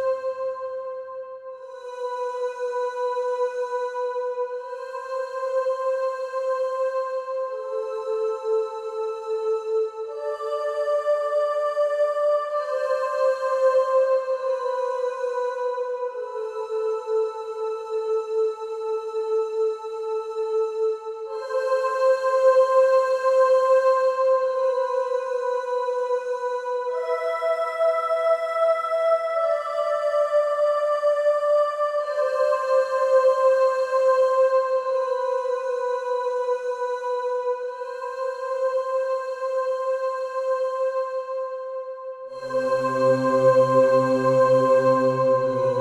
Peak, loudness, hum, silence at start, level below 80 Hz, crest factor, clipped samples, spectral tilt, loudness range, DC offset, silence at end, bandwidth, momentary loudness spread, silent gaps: -8 dBFS; -23 LUFS; none; 0 s; -72 dBFS; 16 dB; under 0.1%; -5.5 dB/octave; 7 LU; under 0.1%; 0 s; 10 kHz; 11 LU; none